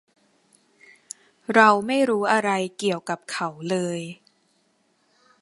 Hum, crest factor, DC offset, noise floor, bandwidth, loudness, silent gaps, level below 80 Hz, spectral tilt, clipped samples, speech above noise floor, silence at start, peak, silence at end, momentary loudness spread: none; 24 dB; under 0.1%; -66 dBFS; 11.5 kHz; -22 LUFS; none; -74 dBFS; -4.5 dB/octave; under 0.1%; 44 dB; 1.5 s; 0 dBFS; 1.3 s; 22 LU